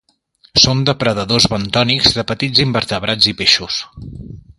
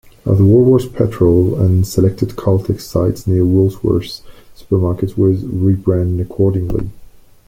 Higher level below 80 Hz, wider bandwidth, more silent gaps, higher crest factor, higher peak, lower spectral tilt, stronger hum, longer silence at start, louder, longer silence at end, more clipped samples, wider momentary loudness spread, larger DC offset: about the same, -40 dBFS vs -36 dBFS; second, 13.5 kHz vs 15.5 kHz; neither; about the same, 16 dB vs 12 dB; about the same, 0 dBFS vs -2 dBFS; second, -3.5 dB/octave vs -9 dB/octave; neither; first, 0.55 s vs 0.25 s; about the same, -13 LUFS vs -15 LUFS; second, 0.2 s vs 0.45 s; neither; first, 12 LU vs 8 LU; neither